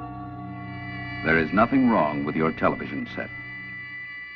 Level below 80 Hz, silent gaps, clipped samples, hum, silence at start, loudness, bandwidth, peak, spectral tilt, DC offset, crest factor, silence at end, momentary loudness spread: -50 dBFS; none; under 0.1%; none; 0 s; -25 LUFS; 6 kHz; -6 dBFS; -9 dB/octave; under 0.1%; 18 dB; 0 s; 16 LU